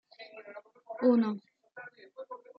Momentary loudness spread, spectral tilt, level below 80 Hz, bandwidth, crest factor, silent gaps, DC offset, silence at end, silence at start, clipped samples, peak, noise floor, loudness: 23 LU; -9 dB/octave; -86 dBFS; 5.2 kHz; 20 dB; none; under 0.1%; 0.25 s; 0.2 s; under 0.1%; -14 dBFS; -52 dBFS; -29 LUFS